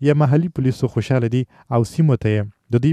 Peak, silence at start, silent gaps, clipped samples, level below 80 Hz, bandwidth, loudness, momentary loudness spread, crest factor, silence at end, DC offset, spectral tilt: -4 dBFS; 0 s; none; under 0.1%; -48 dBFS; 11.5 kHz; -19 LUFS; 6 LU; 14 dB; 0 s; under 0.1%; -8.5 dB/octave